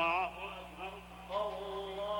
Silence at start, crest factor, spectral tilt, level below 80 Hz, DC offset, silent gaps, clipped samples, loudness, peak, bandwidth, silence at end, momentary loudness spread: 0 s; 16 dB; -4.5 dB/octave; -60 dBFS; under 0.1%; none; under 0.1%; -40 LUFS; -22 dBFS; over 20 kHz; 0 s; 11 LU